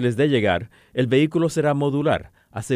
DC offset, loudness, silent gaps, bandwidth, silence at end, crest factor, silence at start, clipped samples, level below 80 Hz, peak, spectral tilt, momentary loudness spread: under 0.1%; -21 LUFS; none; 14.5 kHz; 0 s; 16 dB; 0 s; under 0.1%; -52 dBFS; -6 dBFS; -6.5 dB/octave; 10 LU